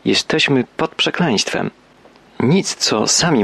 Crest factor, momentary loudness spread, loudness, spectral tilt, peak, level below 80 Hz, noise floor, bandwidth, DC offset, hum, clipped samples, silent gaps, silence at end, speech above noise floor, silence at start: 14 dB; 8 LU; -16 LUFS; -3.5 dB/octave; -4 dBFS; -54 dBFS; -47 dBFS; 13 kHz; under 0.1%; none; under 0.1%; none; 0 s; 31 dB; 0.05 s